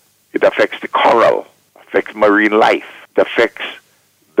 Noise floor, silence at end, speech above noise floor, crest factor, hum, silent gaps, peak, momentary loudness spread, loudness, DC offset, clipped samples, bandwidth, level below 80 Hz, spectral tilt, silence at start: -55 dBFS; 0 s; 42 dB; 14 dB; none; none; -2 dBFS; 11 LU; -14 LUFS; under 0.1%; under 0.1%; 15.5 kHz; -58 dBFS; -4.5 dB/octave; 0.35 s